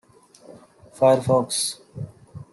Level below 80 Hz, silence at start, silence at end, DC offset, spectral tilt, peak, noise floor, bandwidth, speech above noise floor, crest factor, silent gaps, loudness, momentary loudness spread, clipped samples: -60 dBFS; 0.5 s; 0.1 s; under 0.1%; -4.5 dB/octave; -4 dBFS; -50 dBFS; 12.5 kHz; 29 dB; 20 dB; none; -21 LUFS; 19 LU; under 0.1%